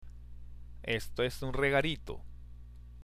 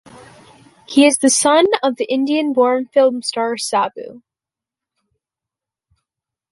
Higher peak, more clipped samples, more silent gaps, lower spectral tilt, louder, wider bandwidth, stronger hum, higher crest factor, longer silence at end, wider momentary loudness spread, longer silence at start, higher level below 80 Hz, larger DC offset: second, -16 dBFS vs 0 dBFS; neither; neither; first, -5 dB/octave vs -2 dB/octave; second, -33 LUFS vs -15 LUFS; first, 15.5 kHz vs 11.5 kHz; first, 60 Hz at -50 dBFS vs none; about the same, 20 dB vs 18 dB; second, 0 s vs 2.35 s; first, 24 LU vs 8 LU; second, 0 s vs 0.9 s; first, -46 dBFS vs -66 dBFS; neither